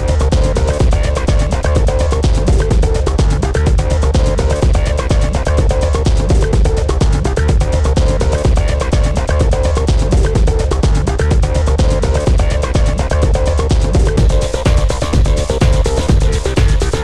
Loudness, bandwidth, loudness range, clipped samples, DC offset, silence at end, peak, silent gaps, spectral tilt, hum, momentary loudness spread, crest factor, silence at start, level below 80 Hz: -14 LUFS; 11.5 kHz; 0 LU; under 0.1%; 1%; 0 s; -2 dBFS; none; -6 dB/octave; none; 2 LU; 10 dB; 0 s; -14 dBFS